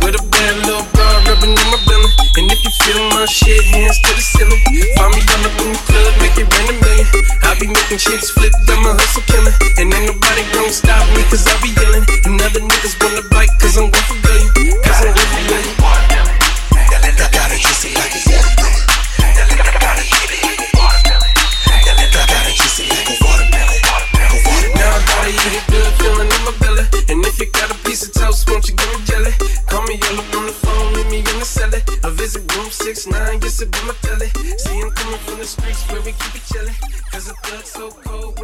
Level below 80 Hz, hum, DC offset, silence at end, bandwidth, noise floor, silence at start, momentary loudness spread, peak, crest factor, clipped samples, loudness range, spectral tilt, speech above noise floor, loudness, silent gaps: -12 dBFS; none; under 0.1%; 0 s; 15.5 kHz; -31 dBFS; 0 s; 10 LU; 0 dBFS; 10 dB; under 0.1%; 9 LU; -3 dB/octave; 22 dB; -12 LUFS; none